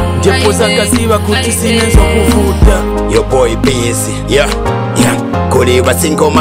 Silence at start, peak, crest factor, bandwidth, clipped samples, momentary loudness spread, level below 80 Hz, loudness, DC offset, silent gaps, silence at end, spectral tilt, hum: 0 s; 0 dBFS; 10 dB; 16.5 kHz; 0.6%; 4 LU; -16 dBFS; -10 LUFS; under 0.1%; none; 0 s; -4.5 dB/octave; none